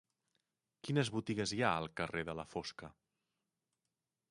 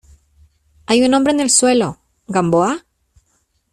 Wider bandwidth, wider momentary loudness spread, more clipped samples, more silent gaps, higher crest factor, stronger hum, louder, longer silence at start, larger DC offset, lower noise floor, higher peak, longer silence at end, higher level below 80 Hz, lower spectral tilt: second, 11.5 kHz vs 13.5 kHz; first, 15 LU vs 10 LU; neither; neither; first, 26 dB vs 18 dB; neither; second, -38 LUFS vs -15 LUFS; about the same, 0.85 s vs 0.9 s; neither; first, under -90 dBFS vs -64 dBFS; second, -16 dBFS vs 0 dBFS; first, 1.4 s vs 0.95 s; second, -68 dBFS vs -52 dBFS; first, -5 dB/octave vs -3.5 dB/octave